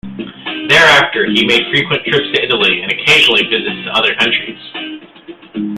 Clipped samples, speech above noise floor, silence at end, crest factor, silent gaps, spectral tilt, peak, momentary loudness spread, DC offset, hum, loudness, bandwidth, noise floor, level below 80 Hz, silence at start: under 0.1%; 22 dB; 0 s; 14 dB; none; -3.5 dB/octave; 0 dBFS; 18 LU; under 0.1%; none; -10 LUFS; 16.5 kHz; -35 dBFS; -50 dBFS; 0.05 s